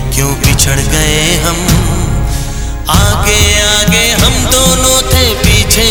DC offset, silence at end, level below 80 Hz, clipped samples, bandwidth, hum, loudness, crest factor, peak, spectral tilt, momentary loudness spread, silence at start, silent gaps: under 0.1%; 0 s; -16 dBFS; 0.9%; over 20 kHz; none; -9 LUFS; 10 dB; 0 dBFS; -3 dB/octave; 7 LU; 0 s; none